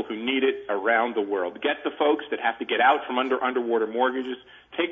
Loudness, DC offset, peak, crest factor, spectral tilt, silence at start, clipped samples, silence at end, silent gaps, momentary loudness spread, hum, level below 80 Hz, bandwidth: -25 LUFS; under 0.1%; -8 dBFS; 18 dB; -6 dB/octave; 0 s; under 0.1%; 0 s; none; 8 LU; none; -72 dBFS; 3.8 kHz